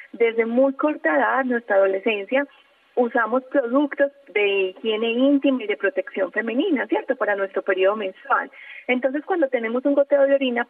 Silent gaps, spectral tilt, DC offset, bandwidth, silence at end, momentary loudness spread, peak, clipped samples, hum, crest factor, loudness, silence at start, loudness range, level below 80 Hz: none; -7.5 dB/octave; under 0.1%; 4 kHz; 0.05 s; 5 LU; -10 dBFS; under 0.1%; none; 12 dB; -21 LUFS; 0 s; 2 LU; -84 dBFS